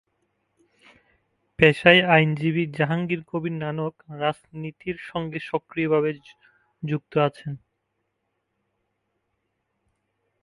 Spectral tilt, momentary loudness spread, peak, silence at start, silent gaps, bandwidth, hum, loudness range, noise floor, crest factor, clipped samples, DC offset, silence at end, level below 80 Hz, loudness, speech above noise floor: -7 dB/octave; 19 LU; 0 dBFS; 1.6 s; none; 11.5 kHz; none; 11 LU; -77 dBFS; 26 dB; under 0.1%; under 0.1%; 2.85 s; -58 dBFS; -23 LUFS; 54 dB